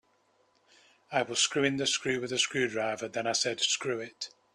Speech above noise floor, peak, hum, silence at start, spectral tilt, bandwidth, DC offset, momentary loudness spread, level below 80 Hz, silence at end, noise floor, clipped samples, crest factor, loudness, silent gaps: 39 dB; -12 dBFS; none; 1.1 s; -2 dB/octave; 13.5 kHz; under 0.1%; 8 LU; -72 dBFS; 0.25 s; -70 dBFS; under 0.1%; 20 dB; -29 LUFS; none